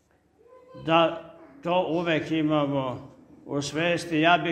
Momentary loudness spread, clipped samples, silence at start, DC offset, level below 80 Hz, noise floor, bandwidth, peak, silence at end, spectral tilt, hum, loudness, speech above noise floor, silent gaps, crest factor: 14 LU; under 0.1%; 0.75 s; under 0.1%; -62 dBFS; -61 dBFS; 12 kHz; -6 dBFS; 0 s; -5.5 dB/octave; none; -25 LUFS; 36 dB; none; 20 dB